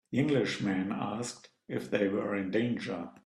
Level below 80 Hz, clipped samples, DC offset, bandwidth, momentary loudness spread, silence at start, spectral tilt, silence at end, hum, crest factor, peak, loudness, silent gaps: -70 dBFS; under 0.1%; under 0.1%; 12.5 kHz; 10 LU; 0.1 s; -6 dB/octave; 0.15 s; none; 18 dB; -14 dBFS; -32 LUFS; none